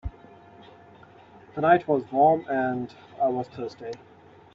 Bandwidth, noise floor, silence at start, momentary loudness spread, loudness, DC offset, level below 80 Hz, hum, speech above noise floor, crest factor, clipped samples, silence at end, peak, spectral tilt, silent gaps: 7.2 kHz; -51 dBFS; 0.05 s; 18 LU; -24 LUFS; under 0.1%; -52 dBFS; none; 27 dB; 20 dB; under 0.1%; 0.6 s; -6 dBFS; -8 dB/octave; none